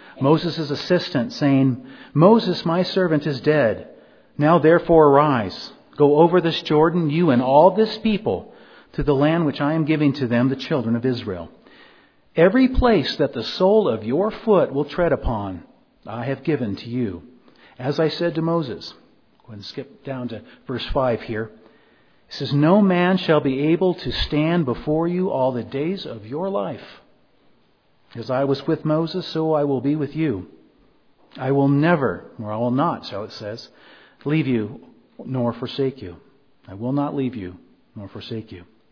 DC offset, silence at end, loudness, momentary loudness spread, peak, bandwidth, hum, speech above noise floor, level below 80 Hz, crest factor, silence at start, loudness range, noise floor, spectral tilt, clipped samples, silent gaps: under 0.1%; 0.3 s; -20 LUFS; 18 LU; 0 dBFS; 5.4 kHz; none; 41 dB; -42 dBFS; 20 dB; 0.05 s; 9 LU; -61 dBFS; -8 dB/octave; under 0.1%; none